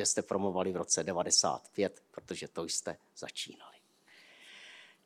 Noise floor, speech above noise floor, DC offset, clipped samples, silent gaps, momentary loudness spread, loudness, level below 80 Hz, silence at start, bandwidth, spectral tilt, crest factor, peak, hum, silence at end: -62 dBFS; 28 dB; under 0.1%; under 0.1%; none; 23 LU; -33 LUFS; -78 dBFS; 0 s; 16 kHz; -2 dB/octave; 24 dB; -12 dBFS; none; 0.2 s